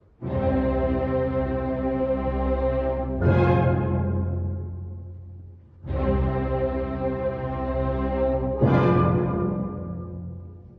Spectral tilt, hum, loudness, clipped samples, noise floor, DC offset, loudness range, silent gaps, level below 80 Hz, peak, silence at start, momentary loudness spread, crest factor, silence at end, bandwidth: -11 dB/octave; none; -25 LUFS; under 0.1%; -44 dBFS; under 0.1%; 4 LU; none; -34 dBFS; -8 dBFS; 0.2 s; 16 LU; 16 dB; 0.05 s; 5 kHz